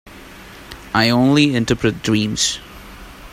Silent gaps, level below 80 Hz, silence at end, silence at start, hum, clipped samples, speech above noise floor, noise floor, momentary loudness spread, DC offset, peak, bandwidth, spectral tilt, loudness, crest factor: none; -42 dBFS; 0.05 s; 0.05 s; none; under 0.1%; 22 dB; -38 dBFS; 24 LU; under 0.1%; 0 dBFS; 16 kHz; -4.5 dB/octave; -16 LUFS; 18 dB